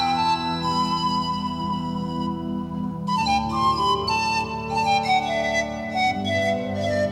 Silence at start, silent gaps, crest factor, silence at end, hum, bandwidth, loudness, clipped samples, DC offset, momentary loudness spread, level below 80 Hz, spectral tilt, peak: 0 s; none; 14 dB; 0 s; none; 14.5 kHz; -23 LUFS; under 0.1%; under 0.1%; 6 LU; -46 dBFS; -5 dB/octave; -8 dBFS